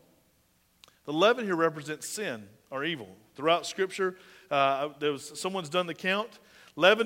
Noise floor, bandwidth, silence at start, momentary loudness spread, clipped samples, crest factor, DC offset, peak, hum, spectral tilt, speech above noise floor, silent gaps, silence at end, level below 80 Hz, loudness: -68 dBFS; 16 kHz; 1.05 s; 15 LU; under 0.1%; 24 dB; under 0.1%; -6 dBFS; none; -3.5 dB/octave; 39 dB; none; 0 s; -78 dBFS; -29 LUFS